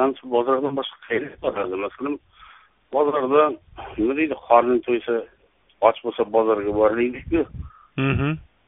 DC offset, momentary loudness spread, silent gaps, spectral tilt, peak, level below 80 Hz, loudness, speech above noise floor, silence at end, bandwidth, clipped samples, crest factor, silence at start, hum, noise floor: under 0.1%; 11 LU; none; -3 dB/octave; 0 dBFS; -46 dBFS; -22 LUFS; 29 dB; 0.25 s; 3.9 kHz; under 0.1%; 22 dB; 0 s; none; -50 dBFS